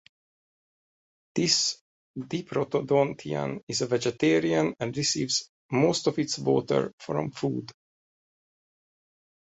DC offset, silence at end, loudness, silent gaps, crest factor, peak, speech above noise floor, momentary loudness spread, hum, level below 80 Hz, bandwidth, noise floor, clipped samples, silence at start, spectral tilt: under 0.1%; 1.75 s; -27 LUFS; 1.81-2.14 s, 3.63-3.67 s, 5.49-5.69 s, 6.93-6.98 s; 20 dB; -10 dBFS; over 63 dB; 11 LU; none; -66 dBFS; 8.4 kHz; under -90 dBFS; under 0.1%; 1.35 s; -4 dB/octave